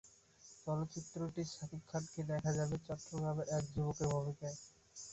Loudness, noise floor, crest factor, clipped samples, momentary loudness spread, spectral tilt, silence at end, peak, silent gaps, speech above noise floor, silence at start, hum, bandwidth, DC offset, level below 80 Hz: -41 LUFS; -63 dBFS; 16 dB; under 0.1%; 13 LU; -6 dB/octave; 0 s; -26 dBFS; none; 23 dB; 0.05 s; none; 8.2 kHz; under 0.1%; -64 dBFS